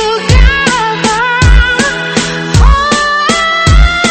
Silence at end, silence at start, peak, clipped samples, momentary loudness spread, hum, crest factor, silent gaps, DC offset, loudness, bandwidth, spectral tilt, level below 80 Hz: 0 s; 0 s; 0 dBFS; 0.7%; 4 LU; none; 8 dB; none; under 0.1%; -9 LUFS; 8.8 kHz; -4 dB/octave; -12 dBFS